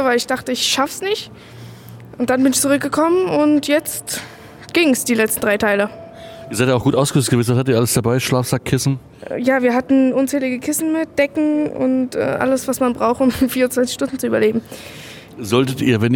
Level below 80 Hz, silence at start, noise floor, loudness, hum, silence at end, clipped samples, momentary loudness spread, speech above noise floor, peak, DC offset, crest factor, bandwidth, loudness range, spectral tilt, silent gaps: -50 dBFS; 0 s; -37 dBFS; -17 LUFS; none; 0 s; under 0.1%; 17 LU; 20 dB; -2 dBFS; under 0.1%; 16 dB; 17.5 kHz; 2 LU; -4.5 dB/octave; none